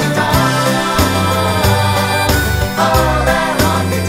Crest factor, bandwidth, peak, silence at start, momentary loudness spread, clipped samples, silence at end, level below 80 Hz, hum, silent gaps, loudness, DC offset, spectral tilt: 14 dB; 16.5 kHz; 0 dBFS; 0 s; 1 LU; under 0.1%; 0 s; -24 dBFS; none; none; -13 LUFS; under 0.1%; -4.5 dB/octave